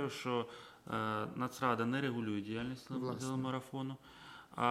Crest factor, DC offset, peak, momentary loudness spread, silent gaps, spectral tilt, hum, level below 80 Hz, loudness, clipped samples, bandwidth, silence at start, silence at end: 20 dB; under 0.1%; -18 dBFS; 14 LU; none; -6 dB/octave; none; -72 dBFS; -39 LUFS; under 0.1%; 16 kHz; 0 s; 0 s